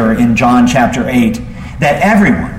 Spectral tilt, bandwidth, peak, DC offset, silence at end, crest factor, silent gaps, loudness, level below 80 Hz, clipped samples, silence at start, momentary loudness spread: -6 dB/octave; 15.5 kHz; 0 dBFS; under 0.1%; 0 s; 10 dB; none; -10 LUFS; -30 dBFS; under 0.1%; 0 s; 6 LU